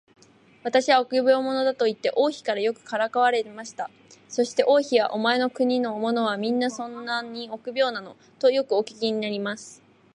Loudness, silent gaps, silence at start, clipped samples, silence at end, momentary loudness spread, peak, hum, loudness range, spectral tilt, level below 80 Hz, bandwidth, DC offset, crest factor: -24 LUFS; none; 0.65 s; under 0.1%; 0.4 s; 14 LU; -6 dBFS; none; 3 LU; -3.5 dB/octave; -78 dBFS; 10.5 kHz; under 0.1%; 18 dB